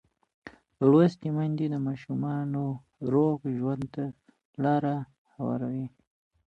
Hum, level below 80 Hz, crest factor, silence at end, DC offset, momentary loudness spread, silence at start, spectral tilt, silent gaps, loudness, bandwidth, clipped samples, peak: none; -66 dBFS; 20 dB; 0.6 s; under 0.1%; 14 LU; 0.45 s; -10 dB/octave; 4.45-4.53 s, 5.18-5.25 s; -28 LUFS; 8 kHz; under 0.1%; -10 dBFS